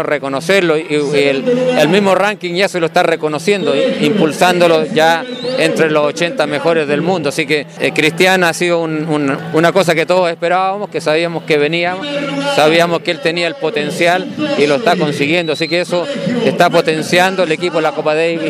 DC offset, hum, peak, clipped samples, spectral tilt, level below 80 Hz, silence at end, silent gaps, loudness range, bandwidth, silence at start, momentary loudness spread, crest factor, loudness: under 0.1%; none; 0 dBFS; under 0.1%; -4.5 dB/octave; -68 dBFS; 0 s; none; 1 LU; 15.5 kHz; 0 s; 5 LU; 14 dB; -13 LUFS